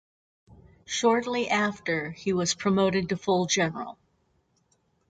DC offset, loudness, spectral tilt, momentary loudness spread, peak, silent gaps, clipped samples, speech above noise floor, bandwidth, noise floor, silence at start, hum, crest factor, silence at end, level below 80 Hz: under 0.1%; -26 LUFS; -4 dB/octave; 6 LU; -10 dBFS; none; under 0.1%; 44 dB; 9.4 kHz; -70 dBFS; 0.9 s; none; 18 dB; 1.15 s; -62 dBFS